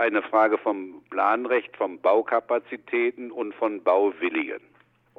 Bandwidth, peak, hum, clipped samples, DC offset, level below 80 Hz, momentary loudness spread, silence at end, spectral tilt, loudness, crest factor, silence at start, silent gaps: 5.2 kHz; -6 dBFS; none; under 0.1%; under 0.1%; -80 dBFS; 11 LU; 0.6 s; -6.5 dB/octave; -25 LUFS; 18 dB; 0 s; none